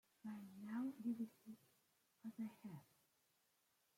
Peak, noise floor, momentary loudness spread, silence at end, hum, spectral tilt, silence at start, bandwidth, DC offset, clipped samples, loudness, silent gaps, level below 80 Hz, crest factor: -36 dBFS; -83 dBFS; 16 LU; 1.15 s; none; -7 dB/octave; 0.25 s; 16.5 kHz; under 0.1%; under 0.1%; -51 LUFS; none; under -90 dBFS; 16 dB